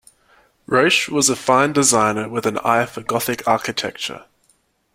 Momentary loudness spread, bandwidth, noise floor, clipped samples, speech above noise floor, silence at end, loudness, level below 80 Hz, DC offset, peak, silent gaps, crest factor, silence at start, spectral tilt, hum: 10 LU; 16.5 kHz; -62 dBFS; under 0.1%; 44 dB; 0.75 s; -18 LUFS; -58 dBFS; under 0.1%; -2 dBFS; none; 18 dB; 0.7 s; -3 dB/octave; none